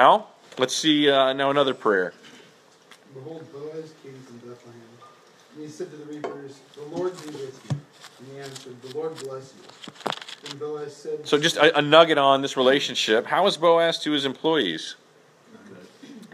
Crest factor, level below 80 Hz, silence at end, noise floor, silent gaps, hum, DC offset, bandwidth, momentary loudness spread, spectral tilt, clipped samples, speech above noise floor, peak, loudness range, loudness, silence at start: 24 dB; -78 dBFS; 0.1 s; -55 dBFS; none; none; under 0.1%; 14.5 kHz; 23 LU; -3.5 dB/octave; under 0.1%; 32 dB; 0 dBFS; 21 LU; -22 LUFS; 0 s